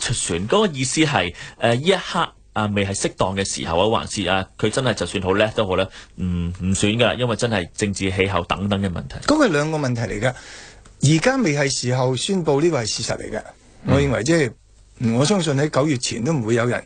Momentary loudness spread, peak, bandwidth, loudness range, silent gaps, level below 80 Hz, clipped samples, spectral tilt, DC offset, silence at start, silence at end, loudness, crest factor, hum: 7 LU; -2 dBFS; 9.6 kHz; 1 LU; none; -44 dBFS; under 0.1%; -4.5 dB/octave; under 0.1%; 0 s; 0 s; -20 LUFS; 20 dB; none